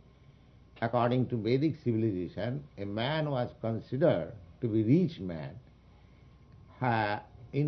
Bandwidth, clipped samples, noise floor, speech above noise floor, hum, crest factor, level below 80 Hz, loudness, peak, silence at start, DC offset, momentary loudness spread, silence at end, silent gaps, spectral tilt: 6 kHz; under 0.1%; -58 dBFS; 27 dB; none; 18 dB; -60 dBFS; -31 LUFS; -14 dBFS; 0.75 s; under 0.1%; 11 LU; 0 s; none; -9.5 dB/octave